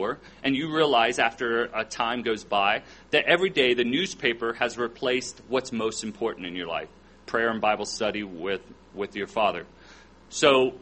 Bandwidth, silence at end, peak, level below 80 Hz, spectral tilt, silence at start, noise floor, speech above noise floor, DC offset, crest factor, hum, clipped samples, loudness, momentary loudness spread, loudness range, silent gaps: 8.8 kHz; 0.05 s; -4 dBFS; -58 dBFS; -3.5 dB/octave; 0 s; -51 dBFS; 25 dB; under 0.1%; 22 dB; none; under 0.1%; -26 LUFS; 11 LU; 5 LU; none